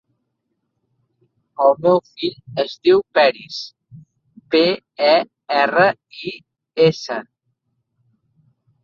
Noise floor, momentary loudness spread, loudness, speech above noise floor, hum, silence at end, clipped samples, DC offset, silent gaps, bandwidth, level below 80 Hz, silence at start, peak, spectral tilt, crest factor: -74 dBFS; 16 LU; -18 LUFS; 57 dB; none; 1.6 s; under 0.1%; under 0.1%; none; 7.2 kHz; -66 dBFS; 1.6 s; -2 dBFS; -5.5 dB/octave; 18 dB